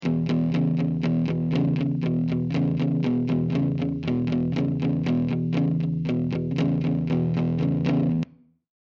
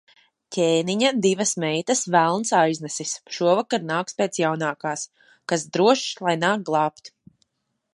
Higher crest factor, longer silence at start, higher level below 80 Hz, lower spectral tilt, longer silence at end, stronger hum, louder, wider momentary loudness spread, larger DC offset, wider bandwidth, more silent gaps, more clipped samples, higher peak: second, 12 dB vs 20 dB; second, 0 s vs 0.5 s; first, -50 dBFS vs -74 dBFS; first, -9.5 dB/octave vs -3.5 dB/octave; about the same, 0.75 s vs 0.85 s; neither; about the same, -24 LUFS vs -22 LUFS; second, 2 LU vs 9 LU; neither; second, 6.2 kHz vs 11.5 kHz; neither; neither; second, -12 dBFS vs -4 dBFS